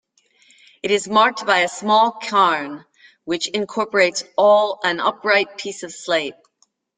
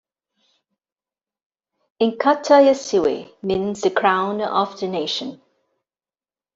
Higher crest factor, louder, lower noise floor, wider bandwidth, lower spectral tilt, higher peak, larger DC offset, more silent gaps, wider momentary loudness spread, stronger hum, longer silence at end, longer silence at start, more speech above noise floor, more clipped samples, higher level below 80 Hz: about the same, 18 dB vs 18 dB; about the same, -18 LUFS vs -19 LUFS; second, -64 dBFS vs under -90 dBFS; first, 9.4 kHz vs 7.8 kHz; second, -2.5 dB/octave vs -4.5 dB/octave; about the same, -2 dBFS vs -4 dBFS; neither; neither; first, 14 LU vs 11 LU; neither; second, 0.65 s vs 1.2 s; second, 0.85 s vs 2 s; second, 45 dB vs over 71 dB; neither; second, -68 dBFS vs -60 dBFS